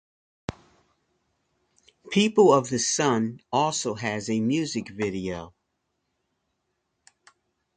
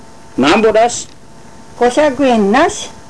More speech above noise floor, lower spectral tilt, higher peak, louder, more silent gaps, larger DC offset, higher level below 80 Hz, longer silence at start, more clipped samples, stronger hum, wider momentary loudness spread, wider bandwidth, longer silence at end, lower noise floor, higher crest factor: first, 54 dB vs 27 dB; about the same, -4 dB/octave vs -4 dB/octave; about the same, -6 dBFS vs -4 dBFS; second, -24 LUFS vs -12 LUFS; neither; second, under 0.1% vs 2%; second, -60 dBFS vs -44 dBFS; first, 0.5 s vs 0.35 s; neither; neither; first, 19 LU vs 12 LU; second, 9.6 kHz vs 11 kHz; first, 2.25 s vs 0.1 s; first, -77 dBFS vs -39 dBFS; first, 22 dB vs 10 dB